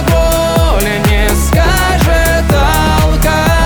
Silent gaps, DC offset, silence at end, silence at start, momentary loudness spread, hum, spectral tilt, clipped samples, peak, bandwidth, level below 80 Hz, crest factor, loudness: none; under 0.1%; 0 s; 0 s; 1 LU; none; -5 dB/octave; under 0.1%; 0 dBFS; over 20 kHz; -14 dBFS; 10 dB; -11 LUFS